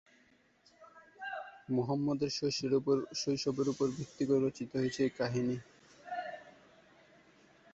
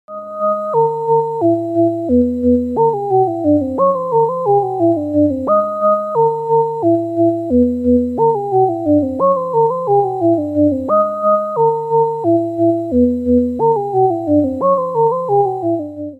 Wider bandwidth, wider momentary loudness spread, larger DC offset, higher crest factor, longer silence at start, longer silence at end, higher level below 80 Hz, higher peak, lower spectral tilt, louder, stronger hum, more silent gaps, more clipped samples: about the same, 8 kHz vs 7.8 kHz; first, 12 LU vs 2 LU; neither; about the same, 16 dB vs 12 dB; first, 0.8 s vs 0.1 s; first, 1.25 s vs 0.05 s; second, -70 dBFS vs -42 dBFS; second, -20 dBFS vs -2 dBFS; second, -5.5 dB/octave vs -11 dB/octave; second, -35 LUFS vs -15 LUFS; neither; neither; neither